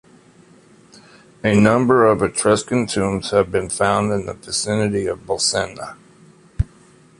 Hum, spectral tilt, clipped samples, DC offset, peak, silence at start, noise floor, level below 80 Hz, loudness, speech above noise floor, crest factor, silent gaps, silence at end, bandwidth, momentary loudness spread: none; -4.5 dB/octave; under 0.1%; under 0.1%; 0 dBFS; 1.45 s; -49 dBFS; -40 dBFS; -18 LUFS; 31 dB; 20 dB; none; 0.55 s; 11.5 kHz; 12 LU